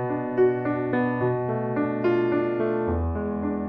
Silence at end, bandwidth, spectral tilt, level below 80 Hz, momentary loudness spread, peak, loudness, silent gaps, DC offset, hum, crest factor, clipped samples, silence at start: 0 s; 5 kHz; -11 dB/octave; -42 dBFS; 5 LU; -10 dBFS; -25 LUFS; none; under 0.1%; none; 14 dB; under 0.1%; 0 s